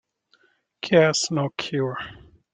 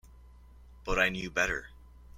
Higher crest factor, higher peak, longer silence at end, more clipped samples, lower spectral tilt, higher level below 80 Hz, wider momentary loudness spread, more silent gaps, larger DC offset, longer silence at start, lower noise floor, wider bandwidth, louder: about the same, 22 dB vs 24 dB; first, -4 dBFS vs -10 dBFS; first, 0.4 s vs 0 s; neither; about the same, -4.5 dB/octave vs -3.5 dB/octave; second, -60 dBFS vs -46 dBFS; first, 17 LU vs 10 LU; neither; neither; first, 0.85 s vs 0.05 s; first, -64 dBFS vs -54 dBFS; second, 9.6 kHz vs 16.5 kHz; first, -22 LUFS vs -30 LUFS